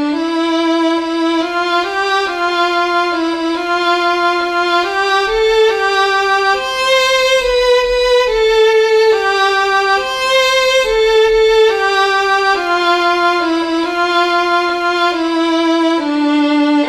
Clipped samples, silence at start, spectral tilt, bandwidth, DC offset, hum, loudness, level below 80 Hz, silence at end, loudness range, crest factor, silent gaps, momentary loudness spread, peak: under 0.1%; 0 s; -2 dB/octave; 14.5 kHz; under 0.1%; none; -13 LUFS; -40 dBFS; 0 s; 3 LU; 12 dB; none; 5 LU; -2 dBFS